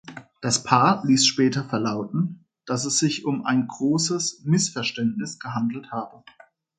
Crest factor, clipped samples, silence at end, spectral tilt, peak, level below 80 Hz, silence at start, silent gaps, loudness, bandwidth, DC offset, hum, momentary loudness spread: 22 dB; under 0.1%; 0.65 s; -4 dB/octave; -2 dBFS; -66 dBFS; 0.05 s; none; -23 LUFS; 9.4 kHz; under 0.1%; none; 13 LU